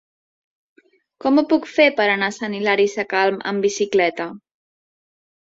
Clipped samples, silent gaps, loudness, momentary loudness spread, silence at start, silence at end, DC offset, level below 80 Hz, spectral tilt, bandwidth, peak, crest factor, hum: under 0.1%; none; -19 LUFS; 8 LU; 1.25 s; 1.05 s; under 0.1%; -66 dBFS; -4 dB/octave; 7.8 kHz; -2 dBFS; 20 dB; none